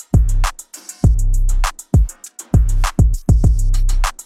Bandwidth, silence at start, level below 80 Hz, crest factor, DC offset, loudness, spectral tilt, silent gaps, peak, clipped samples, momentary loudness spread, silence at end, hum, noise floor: 15 kHz; 0.15 s; -16 dBFS; 12 dB; under 0.1%; -18 LUFS; -5.5 dB/octave; none; -2 dBFS; under 0.1%; 9 LU; 0.1 s; none; -36 dBFS